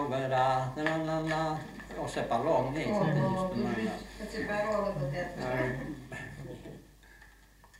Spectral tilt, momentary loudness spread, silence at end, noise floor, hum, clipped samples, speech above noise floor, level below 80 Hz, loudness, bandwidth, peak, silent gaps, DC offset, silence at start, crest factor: -6.5 dB/octave; 14 LU; 0 s; -58 dBFS; none; under 0.1%; 26 dB; -54 dBFS; -32 LUFS; 16 kHz; -12 dBFS; none; under 0.1%; 0 s; 20 dB